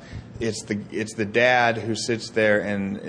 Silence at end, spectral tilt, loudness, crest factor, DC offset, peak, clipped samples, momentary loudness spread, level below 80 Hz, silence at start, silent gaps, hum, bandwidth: 0 s; -4.5 dB/octave; -23 LUFS; 18 dB; under 0.1%; -6 dBFS; under 0.1%; 11 LU; -52 dBFS; 0 s; none; none; 10.5 kHz